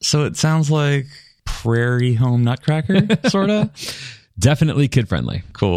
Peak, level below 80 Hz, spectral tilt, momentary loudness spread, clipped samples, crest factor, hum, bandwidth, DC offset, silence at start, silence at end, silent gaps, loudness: -2 dBFS; -40 dBFS; -6 dB/octave; 12 LU; under 0.1%; 16 dB; none; 14.5 kHz; under 0.1%; 0 s; 0 s; none; -18 LUFS